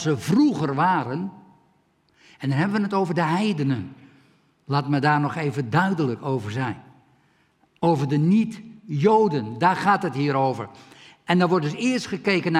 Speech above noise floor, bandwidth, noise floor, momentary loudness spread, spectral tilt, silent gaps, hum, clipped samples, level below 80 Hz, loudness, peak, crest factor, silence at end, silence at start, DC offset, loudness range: 42 dB; 13 kHz; -64 dBFS; 11 LU; -7 dB/octave; none; none; under 0.1%; -68 dBFS; -23 LUFS; -4 dBFS; 18 dB; 0 s; 0 s; under 0.1%; 4 LU